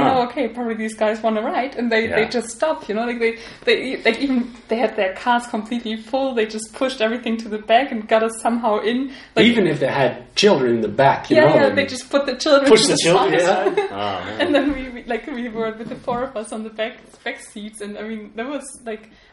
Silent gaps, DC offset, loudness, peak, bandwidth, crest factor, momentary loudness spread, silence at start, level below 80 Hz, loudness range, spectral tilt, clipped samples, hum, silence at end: none; under 0.1%; -19 LUFS; 0 dBFS; 11.5 kHz; 18 dB; 15 LU; 0 s; -52 dBFS; 11 LU; -4 dB/octave; under 0.1%; none; 0.35 s